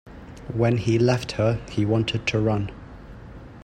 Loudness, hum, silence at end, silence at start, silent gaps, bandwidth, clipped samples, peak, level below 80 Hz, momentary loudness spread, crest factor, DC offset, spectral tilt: -23 LUFS; none; 0 s; 0.05 s; none; 9.6 kHz; under 0.1%; -8 dBFS; -46 dBFS; 22 LU; 16 dB; under 0.1%; -6.5 dB/octave